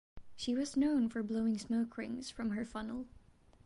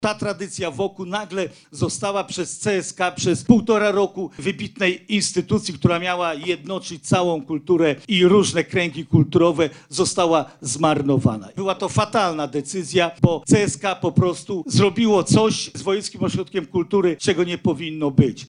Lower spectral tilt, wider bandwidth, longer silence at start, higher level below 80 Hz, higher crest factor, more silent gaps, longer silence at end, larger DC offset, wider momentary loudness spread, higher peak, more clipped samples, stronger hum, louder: about the same, -5 dB/octave vs -5 dB/octave; about the same, 11 kHz vs 10.5 kHz; first, 0.15 s vs 0 s; second, -62 dBFS vs -52 dBFS; second, 14 dB vs 20 dB; neither; first, 0.45 s vs 0.05 s; neither; about the same, 10 LU vs 10 LU; second, -24 dBFS vs -2 dBFS; neither; neither; second, -37 LUFS vs -20 LUFS